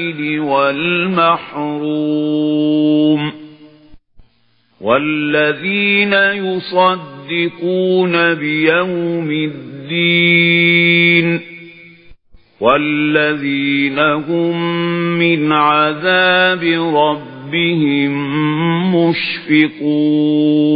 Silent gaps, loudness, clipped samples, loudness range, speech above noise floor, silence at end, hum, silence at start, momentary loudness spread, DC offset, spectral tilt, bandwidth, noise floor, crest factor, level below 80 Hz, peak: none; -14 LUFS; under 0.1%; 4 LU; 44 dB; 0 s; none; 0 s; 9 LU; under 0.1%; -9.5 dB/octave; 5 kHz; -58 dBFS; 14 dB; -56 dBFS; 0 dBFS